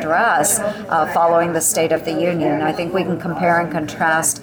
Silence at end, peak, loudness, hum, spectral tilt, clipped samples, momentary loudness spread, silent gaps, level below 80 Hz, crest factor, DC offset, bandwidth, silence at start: 0 s; -6 dBFS; -17 LUFS; none; -3.5 dB/octave; under 0.1%; 5 LU; none; -52 dBFS; 12 dB; under 0.1%; over 20 kHz; 0 s